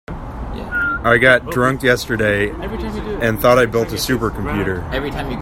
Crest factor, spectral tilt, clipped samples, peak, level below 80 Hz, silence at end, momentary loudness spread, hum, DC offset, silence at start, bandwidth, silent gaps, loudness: 18 dB; -5 dB/octave; under 0.1%; 0 dBFS; -32 dBFS; 0 s; 12 LU; none; under 0.1%; 0.1 s; 16.5 kHz; none; -17 LUFS